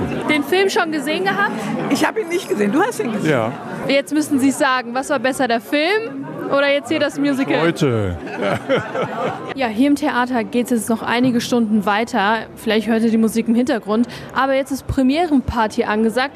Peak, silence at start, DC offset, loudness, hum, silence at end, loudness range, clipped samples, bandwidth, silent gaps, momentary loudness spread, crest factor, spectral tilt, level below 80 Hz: -2 dBFS; 0 s; under 0.1%; -18 LUFS; none; 0 s; 1 LU; under 0.1%; 14 kHz; none; 6 LU; 16 dB; -5 dB/octave; -44 dBFS